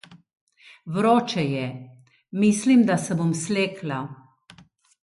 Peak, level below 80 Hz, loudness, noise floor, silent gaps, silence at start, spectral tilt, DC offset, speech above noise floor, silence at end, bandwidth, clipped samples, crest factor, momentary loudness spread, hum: -6 dBFS; -66 dBFS; -23 LUFS; -54 dBFS; 0.41-0.47 s; 0.1 s; -5.5 dB/octave; under 0.1%; 32 dB; 0.9 s; 11.5 kHz; under 0.1%; 18 dB; 16 LU; none